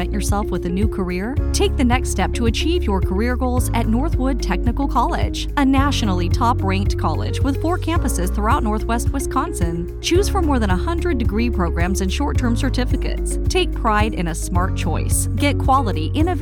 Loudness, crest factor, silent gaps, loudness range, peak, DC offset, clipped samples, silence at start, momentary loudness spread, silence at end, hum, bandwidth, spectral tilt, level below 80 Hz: -20 LUFS; 14 dB; none; 1 LU; -4 dBFS; under 0.1%; under 0.1%; 0 s; 4 LU; 0 s; none; 18 kHz; -5.5 dB/octave; -22 dBFS